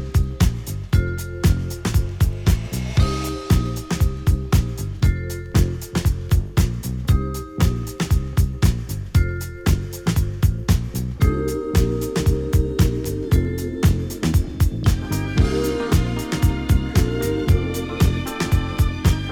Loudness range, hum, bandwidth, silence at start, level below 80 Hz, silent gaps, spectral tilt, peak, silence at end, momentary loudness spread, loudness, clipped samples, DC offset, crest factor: 1 LU; none; 19.5 kHz; 0 s; -24 dBFS; none; -6.5 dB/octave; -4 dBFS; 0 s; 4 LU; -21 LUFS; under 0.1%; under 0.1%; 16 dB